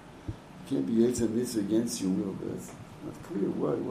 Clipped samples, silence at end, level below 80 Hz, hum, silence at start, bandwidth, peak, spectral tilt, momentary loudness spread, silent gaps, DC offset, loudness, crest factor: under 0.1%; 0 s; -56 dBFS; none; 0 s; 15.5 kHz; -14 dBFS; -6 dB/octave; 17 LU; none; under 0.1%; -30 LUFS; 18 dB